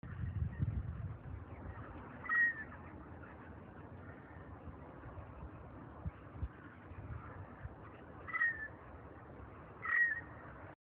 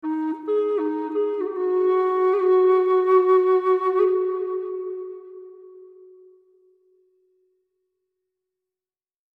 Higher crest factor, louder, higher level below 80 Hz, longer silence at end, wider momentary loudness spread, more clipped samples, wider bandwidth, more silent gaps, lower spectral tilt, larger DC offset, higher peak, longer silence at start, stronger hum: about the same, 20 dB vs 16 dB; second, -39 LUFS vs -21 LUFS; first, -54 dBFS vs -82 dBFS; second, 0.1 s vs 3.5 s; first, 21 LU vs 15 LU; neither; about the same, 4.1 kHz vs 4.3 kHz; neither; about the same, -6 dB/octave vs -6 dB/octave; neither; second, -24 dBFS vs -8 dBFS; about the same, 0.05 s vs 0.05 s; neither